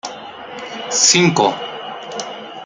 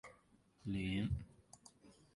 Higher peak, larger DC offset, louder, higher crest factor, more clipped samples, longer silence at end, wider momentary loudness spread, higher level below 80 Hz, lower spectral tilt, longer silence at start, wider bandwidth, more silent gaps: first, 0 dBFS vs -28 dBFS; neither; first, -13 LUFS vs -42 LUFS; about the same, 18 dB vs 16 dB; neither; second, 0 s vs 0.25 s; about the same, 20 LU vs 22 LU; second, -62 dBFS vs -56 dBFS; second, -2.5 dB/octave vs -6.5 dB/octave; about the same, 0.05 s vs 0.05 s; about the same, 11 kHz vs 11.5 kHz; neither